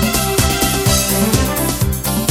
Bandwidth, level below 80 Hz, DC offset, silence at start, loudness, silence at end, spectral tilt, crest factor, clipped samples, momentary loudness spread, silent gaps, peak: 19 kHz; -24 dBFS; under 0.1%; 0 s; -15 LUFS; 0 s; -4 dB/octave; 14 dB; under 0.1%; 4 LU; none; 0 dBFS